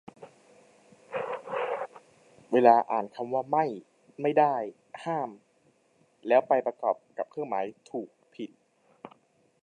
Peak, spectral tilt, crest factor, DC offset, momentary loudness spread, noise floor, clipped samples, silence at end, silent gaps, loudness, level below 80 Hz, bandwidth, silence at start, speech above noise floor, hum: -6 dBFS; -7 dB/octave; 24 dB; under 0.1%; 20 LU; -67 dBFS; under 0.1%; 0.55 s; none; -28 LUFS; -84 dBFS; 9.8 kHz; 0.2 s; 40 dB; none